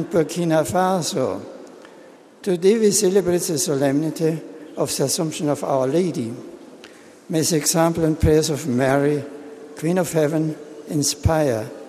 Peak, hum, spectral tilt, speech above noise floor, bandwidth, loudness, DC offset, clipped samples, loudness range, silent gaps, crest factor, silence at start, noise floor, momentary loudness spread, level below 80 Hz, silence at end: -4 dBFS; none; -5 dB/octave; 26 dB; 15.5 kHz; -20 LUFS; under 0.1%; under 0.1%; 3 LU; none; 18 dB; 0 s; -45 dBFS; 13 LU; -42 dBFS; 0 s